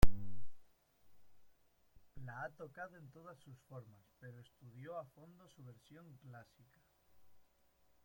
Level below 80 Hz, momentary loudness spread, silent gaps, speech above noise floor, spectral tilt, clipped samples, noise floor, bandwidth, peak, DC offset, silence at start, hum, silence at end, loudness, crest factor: -48 dBFS; 14 LU; none; 17 dB; -6.5 dB/octave; under 0.1%; -73 dBFS; 16.5 kHz; -12 dBFS; under 0.1%; 0 s; none; 3.05 s; -52 LUFS; 24 dB